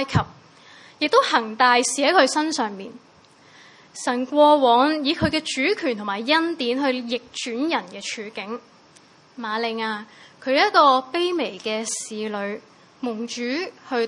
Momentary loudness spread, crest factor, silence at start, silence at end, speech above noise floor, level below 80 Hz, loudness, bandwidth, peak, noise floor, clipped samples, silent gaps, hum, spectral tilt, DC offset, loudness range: 15 LU; 20 dB; 0 s; 0 s; 31 dB; -56 dBFS; -21 LUFS; 11.5 kHz; -2 dBFS; -52 dBFS; under 0.1%; none; none; -3.5 dB/octave; under 0.1%; 7 LU